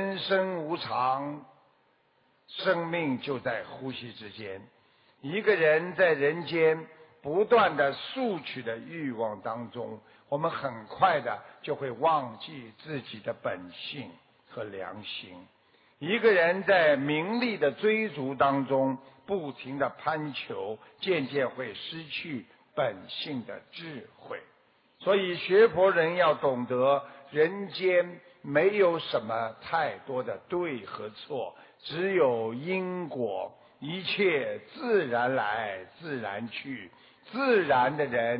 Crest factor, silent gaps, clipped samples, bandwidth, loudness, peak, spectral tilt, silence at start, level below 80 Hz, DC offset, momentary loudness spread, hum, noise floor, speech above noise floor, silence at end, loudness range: 18 dB; none; under 0.1%; 5.4 kHz; -29 LUFS; -12 dBFS; -9.5 dB/octave; 0 s; -72 dBFS; under 0.1%; 17 LU; none; -68 dBFS; 39 dB; 0 s; 8 LU